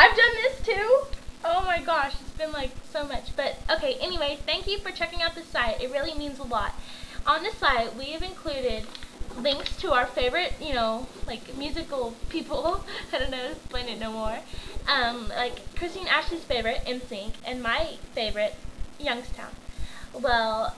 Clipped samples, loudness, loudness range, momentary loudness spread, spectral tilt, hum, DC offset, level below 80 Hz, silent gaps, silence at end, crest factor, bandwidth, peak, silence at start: under 0.1%; -27 LUFS; 4 LU; 13 LU; -3.5 dB/octave; none; 0.3%; -40 dBFS; none; 0 s; 26 dB; 11 kHz; -2 dBFS; 0 s